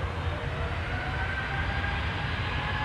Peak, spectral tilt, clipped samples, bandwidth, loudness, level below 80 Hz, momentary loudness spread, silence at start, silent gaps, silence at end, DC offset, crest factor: -18 dBFS; -6 dB/octave; under 0.1%; 11 kHz; -31 LUFS; -36 dBFS; 2 LU; 0 s; none; 0 s; under 0.1%; 12 dB